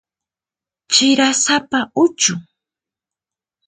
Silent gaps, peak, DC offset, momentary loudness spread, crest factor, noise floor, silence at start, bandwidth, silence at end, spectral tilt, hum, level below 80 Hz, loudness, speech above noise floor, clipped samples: none; 0 dBFS; under 0.1%; 6 LU; 18 dB; -90 dBFS; 0.9 s; 9.6 kHz; 1.25 s; -1.5 dB/octave; none; -64 dBFS; -15 LUFS; 74 dB; under 0.1%